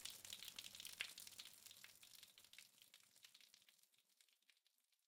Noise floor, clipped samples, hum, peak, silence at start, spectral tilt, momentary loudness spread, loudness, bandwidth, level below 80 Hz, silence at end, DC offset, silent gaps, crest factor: -84 dBFS; under 0.1%; none; -28 dBFS; 0 s; 1.5 dB/octave; 16 LU; -57 LUFS; 17.5 kHz; under -90 dBFS; 0.1 s; under 0.1%; none; 34 dB